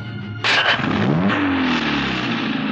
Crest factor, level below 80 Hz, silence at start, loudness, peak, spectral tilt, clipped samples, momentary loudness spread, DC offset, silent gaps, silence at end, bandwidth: 14 dB; -48 dBFS; 0 s; -18 LUFS; -6 dBFS; -5.5 dB/octave; under 0.1%; 6 LU; under 0.1%; none; 0 s; 8.8 kHz